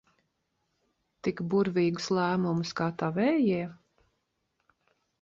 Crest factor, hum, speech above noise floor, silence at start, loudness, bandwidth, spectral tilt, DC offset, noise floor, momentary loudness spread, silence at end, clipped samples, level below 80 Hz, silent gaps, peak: 16 dB; none; 51 dB; 1.25 s; -29 LUFS; 7.6 kHz; -6.5 dB/octave; under 0.1%; -79 dBFS; 8 LU; 1.45 s; under 0.1%; -68 dBFS; none; -14 dBFS